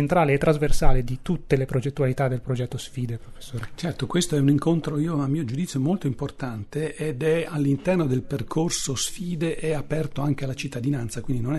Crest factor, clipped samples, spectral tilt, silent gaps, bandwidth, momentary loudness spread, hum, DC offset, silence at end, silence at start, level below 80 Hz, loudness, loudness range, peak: 20 dB; under 0.1%; -6 dB/octave; none; 12.5 kHz; 10 LU; none; under 0.1%; 0 s; 0 s; -32 dBFS; -25 LUFS; 2 LU; -4 dBFS